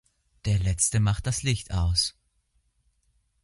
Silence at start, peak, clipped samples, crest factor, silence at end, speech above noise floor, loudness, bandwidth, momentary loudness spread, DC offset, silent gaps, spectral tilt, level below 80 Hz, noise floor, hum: 0.45 s; -10 dBFS; under 0.1%; 18 dB; 1.35 s; 46 dB; -26 LUFS; 11.5 kHz; 6 LU; under 0.1%; none; -3.5 dB/octave; -38 dBFS; -70 dBFS; none